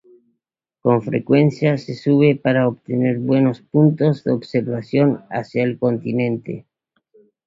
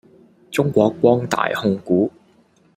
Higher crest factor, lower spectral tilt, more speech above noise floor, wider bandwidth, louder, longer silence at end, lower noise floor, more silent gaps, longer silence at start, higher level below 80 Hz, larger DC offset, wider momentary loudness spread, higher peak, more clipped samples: about the same, 16 dB vs 18 dB; first, -9 dB/octave vs -6.5 dB/octave; first, 61 dB vs 38 dB; second, 7.6 kHz vs 16 kHz; about the same, -18 LUFS vs -19 LUFS; first, 0.85 s vs 0.65 s; first, -79 dBFS vs -56 dBFS; neither; first, 0.85 s vs 0.5 s; about the same, -58 dBFS vs -58 dBFS; neither; about the same, 8 LU vs 7 LU; about the same, -2 dBFS vs 0 dBFS; neither